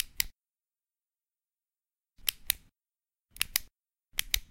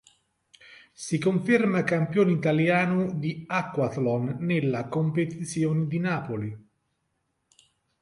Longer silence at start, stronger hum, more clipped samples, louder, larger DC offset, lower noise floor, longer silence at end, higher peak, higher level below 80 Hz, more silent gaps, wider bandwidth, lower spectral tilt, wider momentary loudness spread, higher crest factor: second, 0 s vs 0.7 s; neither; neither; second, -33 LUFS vs -26 LUFS; neither; first, under -90 dBFS vs -76 dBFS; second, 0.05 s vs 1.4 s; first, 0 dBFS vs -8 dBFS; first, -52 dBFS vs -64 dBFS; neither; first, 16.5 kHz vs 11.5 kHz; second, 1.5 dB/octave vs -7 dB/octave; second, 4 LU vs 9 LU; first, 38 dB vs 18 dB